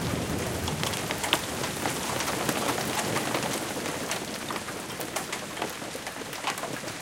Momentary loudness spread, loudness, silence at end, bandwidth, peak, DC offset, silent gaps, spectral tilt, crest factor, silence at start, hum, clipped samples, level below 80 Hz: 7 LU; -30 LUFS; 0 s; 17 kHz; -2 dBFS; under 0.1%; none; -3 dB/octave; 28 dB; 0 s; none; under 0.1%; -52 dBFS